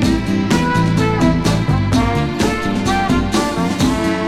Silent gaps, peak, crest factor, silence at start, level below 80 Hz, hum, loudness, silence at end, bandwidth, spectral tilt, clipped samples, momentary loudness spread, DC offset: none; -2 dBFS; 14 dB; 0 s; -28 dBFS; none; -16 LUFS; 0 s; 15.5 kHz; -6 dB/octave; under 0.1%; 3 LU; under 0.1%